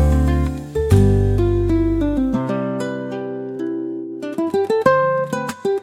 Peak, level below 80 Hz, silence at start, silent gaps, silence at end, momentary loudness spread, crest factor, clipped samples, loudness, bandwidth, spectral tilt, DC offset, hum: -2 dBFS; -26 dBFS; 0 s; none; 0 s; 11 LU; 16 dB; under 0.1%; -19 LUFS; 15 kHz; -8 dB/octave; under 0.1%; none